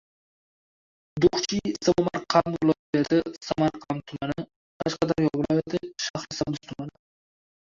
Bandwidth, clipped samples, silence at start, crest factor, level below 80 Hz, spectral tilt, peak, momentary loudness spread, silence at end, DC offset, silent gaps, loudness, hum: 7.6 kHz; under 0.1%; 1.15 s; 22 dB; -54 dBFS; -5.5 dB/octave; -6 dBFS; 11 LU; 0.85 s; under 0.1%; 2.79-2.93 s, 4.56-4.80 s, 6.10-6.14 s; -26 LUFS; none